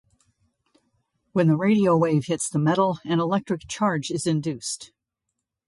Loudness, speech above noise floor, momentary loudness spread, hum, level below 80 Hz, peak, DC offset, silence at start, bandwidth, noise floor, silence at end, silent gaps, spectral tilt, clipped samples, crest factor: -23 LUFS; 59 dB; 10 LU; none; -62 dBFS; -8 dBFS; under 0.1%; 1.35 s; 11.5 kHz; -82 dBFS; 0.8 s; none; -6 dB/octave; under 0.1%; 16 dB